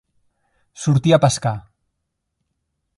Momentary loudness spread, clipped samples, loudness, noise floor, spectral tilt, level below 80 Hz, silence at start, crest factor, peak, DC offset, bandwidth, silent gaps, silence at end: 11 LU; under 0.1%; -18 LUFS; -76 dBFS; -6 dB/octave; -52 dBFS; 0.8 s; 20 dB; 0 dBFS; under 0.1%; 11.5 kHz; none; 1.4 s